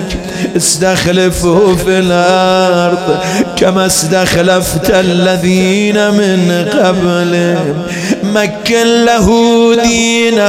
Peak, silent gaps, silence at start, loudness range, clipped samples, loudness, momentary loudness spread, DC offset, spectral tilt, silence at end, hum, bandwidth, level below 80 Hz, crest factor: 0 dBFS; none; 0 s; 1 LU; 0.7%; -10 LUFS; 5 LU; under 0.1%; -4.5 dB/octave; 0 s; none; 16.5 kHz; -32 dBFS; 10 dB